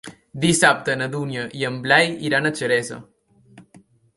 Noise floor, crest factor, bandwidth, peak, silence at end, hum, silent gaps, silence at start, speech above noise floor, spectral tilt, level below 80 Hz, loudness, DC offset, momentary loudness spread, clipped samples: -53 dBFS; 20 dB; 11.5 kHz; -2 dBFS; 0.55 s; none; none; 0.05 s; 32 dB; -3.5 dB/octave; -60 dBFS; -20 LUFS; under 0.1%; 12 LU; under 0.1%